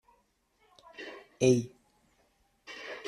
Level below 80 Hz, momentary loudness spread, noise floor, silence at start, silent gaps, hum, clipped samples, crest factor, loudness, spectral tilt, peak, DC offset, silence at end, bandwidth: -68 dBFS; 21 LU; -71 dBFS; 1 s; none; none; under 0.1%; 24 dB; -29 LUFS; -5.5 dB/octave; -12 dBFS; under 0.1%; 0 s; 11.5 kHz